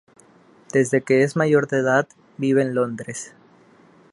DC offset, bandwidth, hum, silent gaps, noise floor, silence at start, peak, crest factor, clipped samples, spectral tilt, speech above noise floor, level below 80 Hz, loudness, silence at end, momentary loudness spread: under 0.1%; 11.5 kHz; none; none; -53 dBFS; 0.75 s; -4 dBFS; 18 dB; under 0.1%; -6 dB/octave; 33 dB; -68 dBFS; -20 LUFS; 0.85 s; 15 LU